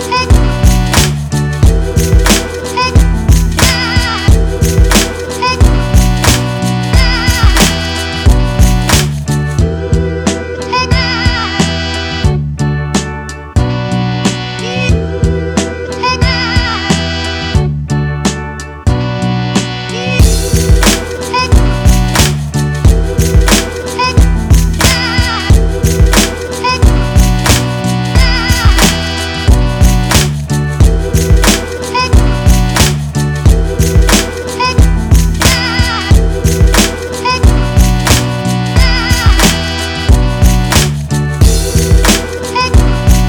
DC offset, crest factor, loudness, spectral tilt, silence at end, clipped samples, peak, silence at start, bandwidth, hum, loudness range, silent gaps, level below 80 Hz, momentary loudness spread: under 0.1%; 10 dB; -11 LUFS; -4.5 dB/octave; 0 s; 0.7%; 0 dBFS; 0 s; over 20 kHz; none; 3 LU; none; -14 dBFS; 6 LU